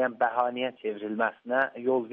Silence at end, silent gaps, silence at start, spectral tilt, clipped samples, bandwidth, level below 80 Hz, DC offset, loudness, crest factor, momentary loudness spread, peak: 0 s; none; 0 s; -2 dB/octave; under 0.1%; 4.8 kHz; -80 dBFS; under 0.1%; -29 LUFS; 18 dB; 6 LU; -10 dBFS